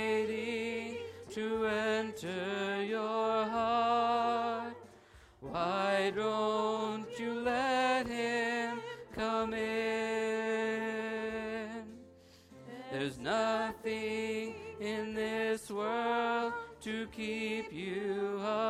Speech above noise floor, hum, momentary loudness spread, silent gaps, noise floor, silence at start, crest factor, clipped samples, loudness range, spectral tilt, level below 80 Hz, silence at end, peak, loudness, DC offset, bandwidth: 24 dB; none; 11 LU; none; -59 dBFS; 0 s; 16 dB; under 0.1%; 5 LU; -4.5 dB/octave; -66 dBFS; 0 s; -18 dBFS; -34 LUFS; under 0.1%; 14.5 kHz